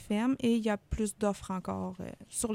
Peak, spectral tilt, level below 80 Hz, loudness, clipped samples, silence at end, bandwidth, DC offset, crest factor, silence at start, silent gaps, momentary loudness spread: -16 dBFS; -5 dB/octave; -50 dBFS; -33 LUFS; under 0.1%; 0 s; 16 kHz; under 0.1%; 16 dB; 0 s; none; 9 LU